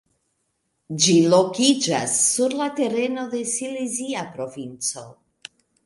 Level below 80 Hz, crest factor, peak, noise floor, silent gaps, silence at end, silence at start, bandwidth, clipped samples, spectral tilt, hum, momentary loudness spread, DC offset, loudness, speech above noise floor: -68 dBFS; 22 dB; -2 dBFS; -73 dBFS; none; 0.75 s; 0.9 s; 11.5 kHz; under 0.1%; -3.5 dB/octave; none; 15 LU; under 0.1%; -21 LUFS; 52 dB